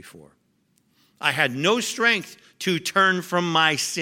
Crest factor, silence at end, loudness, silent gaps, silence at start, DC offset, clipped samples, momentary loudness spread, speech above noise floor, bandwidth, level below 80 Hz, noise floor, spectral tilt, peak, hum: 20 dB; 0 s; -21 LUFS; none; 0.05 s; under 0.1%; under 0.1%; 6 LU; 43 dB; 17 kHz; -76 dBFS; -66 dBFS; -3 dB/octave; -4 dBFS; none